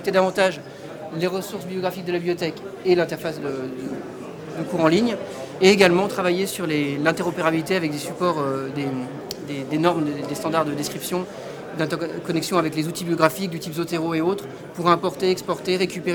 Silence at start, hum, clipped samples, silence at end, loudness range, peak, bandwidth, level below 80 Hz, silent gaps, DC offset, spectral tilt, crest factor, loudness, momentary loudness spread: 0 s; none; under 0.1%; 0 s; 5 LU; 0 dBFS; 20 kHz; -60 dBFS; none; under 0.1%; -5 dB/octave; 22 dB; -23 LUFS; 13 LU